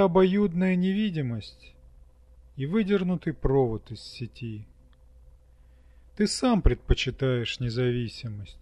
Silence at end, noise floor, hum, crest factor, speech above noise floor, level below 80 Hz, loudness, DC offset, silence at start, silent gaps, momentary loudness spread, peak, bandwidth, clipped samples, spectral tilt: 0.05 s; -55 dBFS; none; 22 dB; 29 dB; -36 dBFS; -27 LUFS; under 0.1%; 0 s; none; 15 LU; -6 dBFS; 11.5 kHz; under 0.1%; -6.5 dB/octave